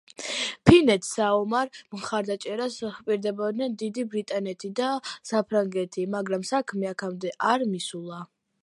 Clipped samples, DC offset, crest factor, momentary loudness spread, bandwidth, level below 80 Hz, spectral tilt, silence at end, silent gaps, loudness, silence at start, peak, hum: under 0.1%; under 0.1%; 24 dB; 10 LU; 11.5 kHz; -52 dBFS; -5 dB/octave; 0.4 s; none; -26 LUFS; 0.2 s; -2 dBFS; none